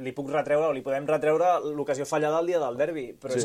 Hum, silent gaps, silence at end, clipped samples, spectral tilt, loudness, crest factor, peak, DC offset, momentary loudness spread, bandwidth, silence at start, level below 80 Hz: none; none; 0 s; under 0.1%; -5 dB/octave; -26 LUFS; 14 dB; -12 dBFS; under 0.1%; 7 LU; 15 kHz; 0 s; -68 dBFS